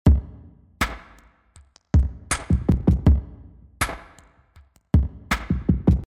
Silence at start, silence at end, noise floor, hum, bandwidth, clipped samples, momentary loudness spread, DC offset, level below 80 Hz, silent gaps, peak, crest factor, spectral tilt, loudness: 0.05 s; 0 s; -54 dBFS; none; 16 kHz; under 0.1%; 8 LU; under 0.1%; -26 dBFS; none; -6 dBFS; 18 dB; -6 dB/octave; -23 LUFS